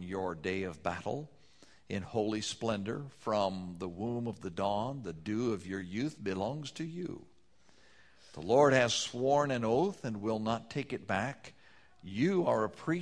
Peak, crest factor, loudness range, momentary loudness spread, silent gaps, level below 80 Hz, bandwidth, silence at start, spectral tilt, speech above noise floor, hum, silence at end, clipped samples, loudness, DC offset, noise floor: -10 dBFS; 24 dB; 6 LU; 13 LU; none; -66 dBFS; 11 kHz; 0 s; -5 dB/octave; 34 dB; none; 0 s; under 0.1%; -34 LUFS; under 0.1%; -67 dBFS